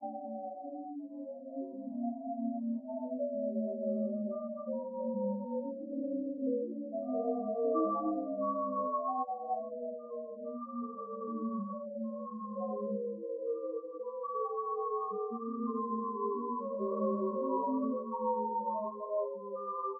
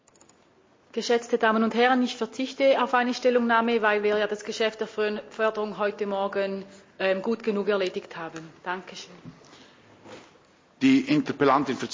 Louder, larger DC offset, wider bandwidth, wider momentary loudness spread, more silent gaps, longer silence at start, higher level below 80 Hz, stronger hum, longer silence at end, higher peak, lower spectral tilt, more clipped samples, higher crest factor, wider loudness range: second, -37 LUFS vs -25 LUFS; neither; second, 1.3 kHz vs 7.6 kHz; second, 8 LU vs 13 LU; neither; second, 0 s vs 0.95 s; second, under -90 dBFS vs -70 dBFS; neither; about the same, 0 s vs 0 s; second, -20 dBFS vs -8 dBFS; second, 2 dB/octave vs -5 dB/octave; neither; about the same, 16 dB vs 18 dB; about the same, 5 LU vs 7 LU